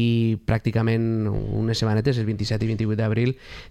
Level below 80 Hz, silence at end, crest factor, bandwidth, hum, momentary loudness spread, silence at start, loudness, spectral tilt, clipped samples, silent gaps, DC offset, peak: -42 dBFS; 0.05 s; 14 dB; 8.8 kHz; none; 4 LU; 0 s; -23 LUFS; -7 dB/octave; under 0.1%; none; under 0.1%; -8 dBFS